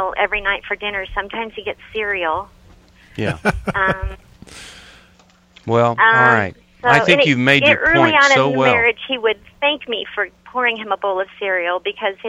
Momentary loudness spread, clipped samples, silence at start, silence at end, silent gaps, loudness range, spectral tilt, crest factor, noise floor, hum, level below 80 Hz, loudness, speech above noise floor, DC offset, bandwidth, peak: 14 LU; under 0.1%; 0 s; 0 s; none; 10 LU; -4.5 dB/octave; 18 dB; -51 dBFS; none; -40 dBFS; -16 LUFS; 34 dB; under 0.1%; 13 kHz; 0 dBFS